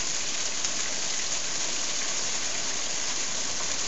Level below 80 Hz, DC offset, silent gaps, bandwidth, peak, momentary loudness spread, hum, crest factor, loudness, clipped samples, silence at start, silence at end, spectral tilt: -60 dBFS; 3%; none; 8.4 kHz; -8 dBFS; 1 LU; none; 24 dB; -27 LUFS; under 0.1%; 0 s; 0 s; 0.5 dB/octave